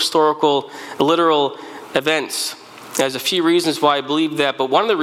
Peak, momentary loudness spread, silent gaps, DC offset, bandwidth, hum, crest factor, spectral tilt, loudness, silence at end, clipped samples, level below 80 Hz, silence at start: -2 dBFS; 9 LU; none; under 0.1%; 16.5 kHz; none; 16 dB; -3 dB/octave; -18 LUFS; 0 s; under 0.1%; -64 dBFS; 0 s